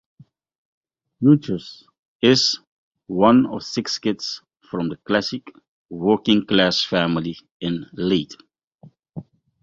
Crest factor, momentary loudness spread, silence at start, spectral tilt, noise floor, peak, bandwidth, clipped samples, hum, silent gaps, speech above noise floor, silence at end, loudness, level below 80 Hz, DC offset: 22 dB; 19 LU; 1.2 s; -5 dB/octave; -51 dBFS; 0 dBFS; 7.8 kHz; under 0.1%; none; 1.99-2.20 s, 2.67-2.91 s, 5.68-5.89 s, 7.51-7.60 s, 8.64-8.71 s; 31 dB; 0.4 s; -20 LUFS; -56 dBFS; under 0.1%